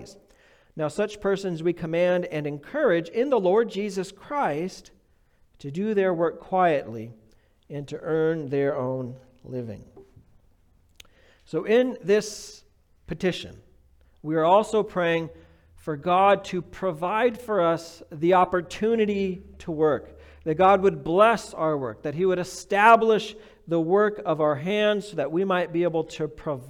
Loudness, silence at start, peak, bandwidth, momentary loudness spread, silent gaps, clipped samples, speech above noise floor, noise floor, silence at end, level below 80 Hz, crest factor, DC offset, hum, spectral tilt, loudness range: -24 LUFS; 0 s; -4 dBFS; 15 kHz; 16 LU; none; under 0.1%; 37 dB; -61 dBFS; 0 s; -58 dBFS; 20 dB; under 0.1%; none; -6 dB/octave; 7 LU